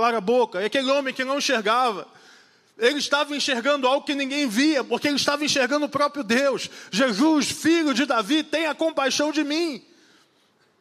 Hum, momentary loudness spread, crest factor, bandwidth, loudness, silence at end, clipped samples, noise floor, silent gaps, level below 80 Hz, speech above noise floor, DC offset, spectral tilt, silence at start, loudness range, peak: none; 5 LU; 18 dB; 15 kHz; -22 LUFS; 1 s; under 0.1%; -63 dBFS; none; -74 dBFS; 40 dB; under 0.1%; -3 dB/octave; 0 s; 2 LU; -4 dBFS